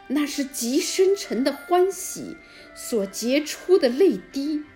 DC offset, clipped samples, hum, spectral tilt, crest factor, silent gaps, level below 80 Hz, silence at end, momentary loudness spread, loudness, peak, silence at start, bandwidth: under 0.1%; under 0.1%; none; -3.5 dB/octave; 16 dB; none; -62 dBFS; 0.1 s; 14 LU; -23 LUFS; -8 dBFS; 0.1 s; 16.5 kHz